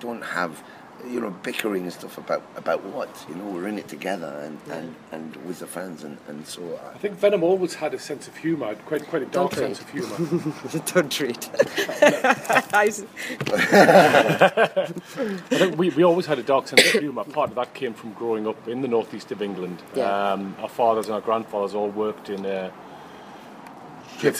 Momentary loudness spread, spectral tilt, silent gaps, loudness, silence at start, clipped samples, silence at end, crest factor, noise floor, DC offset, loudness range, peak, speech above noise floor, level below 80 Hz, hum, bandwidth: 18 LU; -4 dB/octave; none; -23 LUFS; 0 s; under 0.1%; 0 s; 24 dB; -42 dBFS; under 0.1%; 12 LU; 0 dBFS; 19 dB; -70 dBFS; none; 15.5 kHz